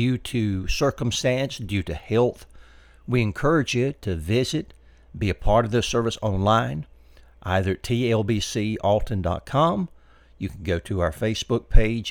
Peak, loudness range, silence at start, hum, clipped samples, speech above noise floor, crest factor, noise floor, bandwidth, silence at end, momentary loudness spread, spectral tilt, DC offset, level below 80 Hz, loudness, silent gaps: -2 dBFS; 2 LU; 0 s; none; under 0.1%; 28 dB; 22 dB; -50 dBFS; 16.5 kHz; 0 s; 9 LU; -5.5 dB/octave; under 0.1%; -32 dBFS; -24 LUFS; none